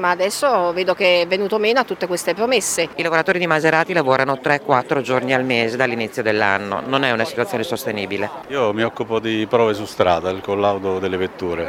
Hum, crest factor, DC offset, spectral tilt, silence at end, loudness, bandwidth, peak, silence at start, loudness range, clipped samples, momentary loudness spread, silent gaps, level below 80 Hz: none; 18 dB; under 0.1%; -4 dB/octave; 0 s; -19 LUFS; 19 kHz; 0 dBFS; 0 s; 3 LU; under 0.1%; 6 LU; none; -56 dBFS